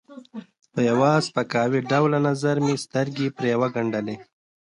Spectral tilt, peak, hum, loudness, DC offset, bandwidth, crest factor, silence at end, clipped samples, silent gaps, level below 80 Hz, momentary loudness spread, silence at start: -6 dB/octave; -6 dBFS; none; -23 LUFS; under 0.1%; 11 kHz; 16 dB; 0.45 s; under 0.1%; none; -66 dBFS; 18 LU; 0.1 s